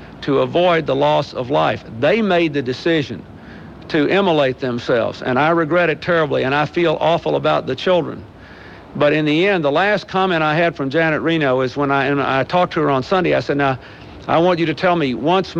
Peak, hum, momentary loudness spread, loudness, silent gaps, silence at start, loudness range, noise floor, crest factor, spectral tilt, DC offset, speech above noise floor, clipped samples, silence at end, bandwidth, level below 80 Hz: -4 dBFS; none; 5 LU; -17 LUFS; none; 0 s; 2 LU; -38 dBFS; 12 dB; -7 dB/octave; under 0.1%; 22 dB; under 0.1%; 0 s; 8 kHz; -48 dBFS